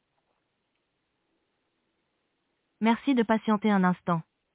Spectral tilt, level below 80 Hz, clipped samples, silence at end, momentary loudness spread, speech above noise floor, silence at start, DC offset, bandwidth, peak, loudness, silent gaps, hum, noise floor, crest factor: -6 dB/octave; -72 dBFS; under 0.1%; 0.35 s; 6 LU; 53 dB; 2.8 s; under 0.1%; 4 kHz; -12 dBFS; -26 LUFS; none; none; -78 dBFS; 18 dB